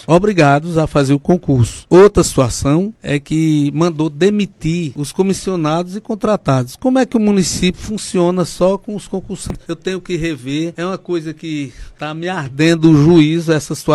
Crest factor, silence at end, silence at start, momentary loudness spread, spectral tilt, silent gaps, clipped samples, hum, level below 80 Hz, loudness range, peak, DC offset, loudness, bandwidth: 14 dB; 0 s; 0.1 s; 14 LU; -6 dB/octave; none; under 0.1%; none; -36 dBFS; 7 LU; 0 dBFS; under 0.1%; -15 LUFS; 13 kHz